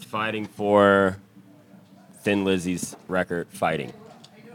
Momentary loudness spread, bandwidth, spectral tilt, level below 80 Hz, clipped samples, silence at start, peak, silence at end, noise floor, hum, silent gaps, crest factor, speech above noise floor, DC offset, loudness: 13 LU; 17.5 kHz; -5.5 dB/octave; -66 dBFS; under 0.1%; 0 s; -4 dBFS; 0 s; -51 dBFS; none; none; 22 dB; 28 dB; under 0.1%; -24 LUFS